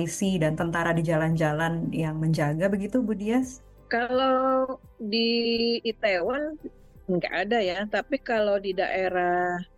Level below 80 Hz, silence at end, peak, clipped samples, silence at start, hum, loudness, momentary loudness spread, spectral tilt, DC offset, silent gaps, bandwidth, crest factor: -52 dBFS; 0.15 s; -12 dBFS; under 0.1%; 0 s; none; -26 LUFS; 6 LU; -5.5 dB/octave; under 0.1%; none; 12.5 kHz; 14 dB